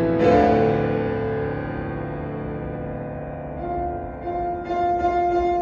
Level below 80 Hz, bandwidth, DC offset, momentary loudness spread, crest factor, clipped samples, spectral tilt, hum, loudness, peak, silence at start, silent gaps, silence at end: -40 dBFS; 7.2 kHz; under 0.1%; 13 LU; 18 dB; under 0.1%; -8.5 dB/octave; none; -23 LUFS; -4 dBFS; 0 s; none; 0 s